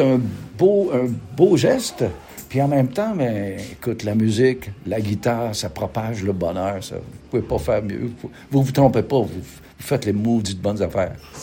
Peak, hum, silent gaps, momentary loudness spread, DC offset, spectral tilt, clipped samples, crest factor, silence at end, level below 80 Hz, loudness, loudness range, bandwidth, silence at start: -2 dBFS; none; none; 12 LU; under 0.1%; -6.5 dB/octave; under 0.1%; 18 dB; 0 s; -46 dBFS; -21 LUFS; 4 LU; 17 kHz; 0 s